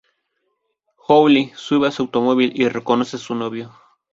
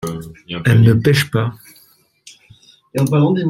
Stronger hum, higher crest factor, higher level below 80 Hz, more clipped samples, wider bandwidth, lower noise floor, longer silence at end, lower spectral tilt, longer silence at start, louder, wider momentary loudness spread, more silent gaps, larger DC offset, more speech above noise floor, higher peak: neither; about the same, 18 dB vs 16 dB; second, -62 dBFS vs -48 dBFS; neither; second, 7.8 kHz vs 15.5 kHz; first, -72 dBFS vs -53 dBFS; first, 0.45 s vs 0 s; about the same, -5.5 dB/octave vs -6.5 dB/octave; first, 1.1 s vs 0.05 s; second, -18 LUFS vs -15 LUFS; about the same, 14 LU vs 16 LU; neither; neither; first, 54 dB vs 39 dB; about the same, -2 dBFS vs -2 dBFS